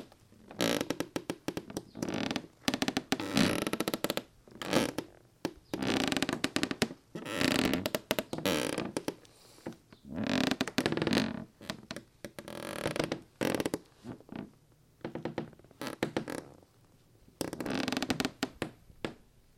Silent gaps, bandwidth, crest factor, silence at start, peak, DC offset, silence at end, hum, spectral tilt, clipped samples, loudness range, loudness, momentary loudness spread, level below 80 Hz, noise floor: none; 16.5 kHz; 30 dB; 0 s; -6 dBFS; under 0.1%; 0.4 s; none; -4 dB/octave; under 0.1%; 6 LU; -34 LUFS; 16 LU; -62 dBFS; -63 dBFS